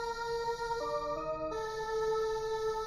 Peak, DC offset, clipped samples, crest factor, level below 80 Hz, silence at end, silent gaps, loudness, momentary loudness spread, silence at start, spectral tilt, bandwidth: -24 dBFS; under 0.1%; under 0.1%; 12 dB; -54 dBFS; 0 s; none; -35 LUFS; 4 LU; 0 s; -3.5 dB/octave; 14 kHz